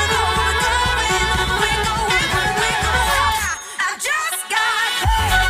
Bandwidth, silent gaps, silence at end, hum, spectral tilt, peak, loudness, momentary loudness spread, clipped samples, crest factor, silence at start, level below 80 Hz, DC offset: 16 kHz; none; 0 s; none; -2 dB/octave; -4 dBFS; -17 LUFS; 4 LU; under 0.1%; 14 dB; 0 s; -28 dBFS; under 0.1%